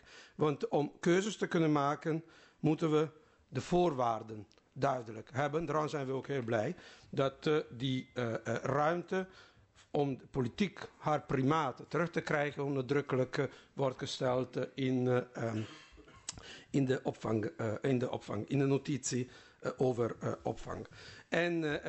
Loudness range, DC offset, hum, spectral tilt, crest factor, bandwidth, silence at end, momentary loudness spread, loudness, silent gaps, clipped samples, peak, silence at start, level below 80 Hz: 3 LU; under 0.1%; none; -6 dB/octave; 18 dB; 8.2 kHz; 0 s; 11 LU; -35 LUFS; none; under 0.1%; -18 dBFS; 0.1 s; -64 dBFS